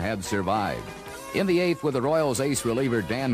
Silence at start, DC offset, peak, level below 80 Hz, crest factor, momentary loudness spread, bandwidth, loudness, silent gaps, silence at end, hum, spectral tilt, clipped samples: 0 s; under 0.1%; -10 dBFS; -52 dBFS; 14 dB; 8 LU; 15.5 kHz; -25 LUFS; none; 0 s; none; -5 dB/octave; under 0.1%